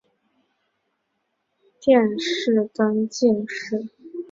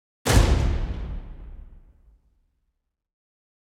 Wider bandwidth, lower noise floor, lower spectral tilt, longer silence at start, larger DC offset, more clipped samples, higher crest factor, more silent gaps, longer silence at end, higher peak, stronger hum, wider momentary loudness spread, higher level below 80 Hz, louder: second, 7.6 kHz vs 16.5 kHz; about the same, -74 dBFS vs -76 dBFS; about the same, -5 dB/octave vs -5 dB/octave; first, 1.8 s vs 0.25 s; neither; neither; about the same, 20 dB vs 22 dB; neither; second, 0.05 s vs 2.05 s; about the same, -4 dBFS vs -4 dBFS; neither; second, 12 LU vs 25 LU; second, -66 dBFS vs -28 dBFS; about the same, -21 LUFS vs -23 LUFS